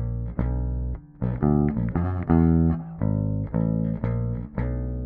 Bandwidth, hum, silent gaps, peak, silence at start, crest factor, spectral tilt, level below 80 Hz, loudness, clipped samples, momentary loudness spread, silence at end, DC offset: 2.7 kHz; none; none; -8 dBFS; 0 s; 16 dB; -13.5 dB/octave; -32 dBFS; -25 LUFS; under 0.1%; 9 LU; 0 s; under 0.1%